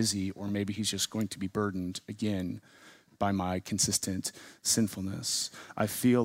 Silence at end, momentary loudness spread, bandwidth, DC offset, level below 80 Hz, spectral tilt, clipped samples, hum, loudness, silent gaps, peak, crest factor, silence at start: 0 s; 9 LU; 16 kHz; under 0.1%; -64 dBFS; -3.5 dB/octave; under 0.1%; none; -32 LUFS; none; -14 dBFS; 18 dB; 0 s